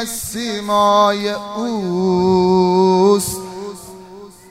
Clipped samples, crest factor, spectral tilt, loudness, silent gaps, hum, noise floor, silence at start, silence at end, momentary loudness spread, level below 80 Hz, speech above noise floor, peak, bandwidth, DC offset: under 0.1%; 14 dB; -5 dB/octave; -16 LUFS; none; none; -38 dBFS; 0 s; 0.2 s; 18 LU; -50 dBFS; 23 dB; -2 dBFS; 16 kHz; under 0.1%